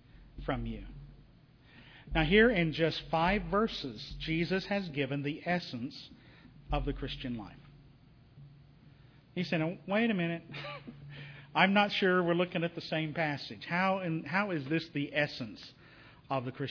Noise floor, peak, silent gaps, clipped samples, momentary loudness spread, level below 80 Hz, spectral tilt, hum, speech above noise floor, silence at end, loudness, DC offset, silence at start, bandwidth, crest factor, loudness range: -60 dBFS; -12 dBFS; none; under 0.1%; 18 LU; -50 dBFS; -7 dB/octave; none; 28 dB; 0 s; -32 LUFS; under 0.1%; 0.15 s; 5.4 kHz; 22 dB; 9 LU